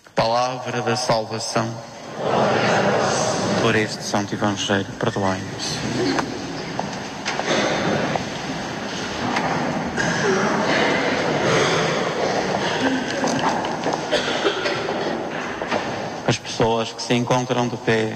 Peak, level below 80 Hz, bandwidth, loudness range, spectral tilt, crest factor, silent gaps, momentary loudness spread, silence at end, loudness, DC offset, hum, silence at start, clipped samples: -6 dBFS; -52 dBFS; 15 kHz; 4 LU; -4 dB/octave; 16 dB; none; 9 LU; 0 s; -22 LUFS; under 0.1%; none; 0.15 s; under 0.1%